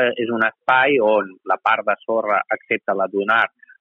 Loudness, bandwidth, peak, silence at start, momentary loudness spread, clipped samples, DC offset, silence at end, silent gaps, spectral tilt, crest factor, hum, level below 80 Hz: -19 LUFS; 5.4 kHz; -4 dBFS; 0 s; 7 LU; under 0.1%; under 0.1%; 0.35 s; none; -6.5 dB/octave; 14 dB; none; -70 dBFS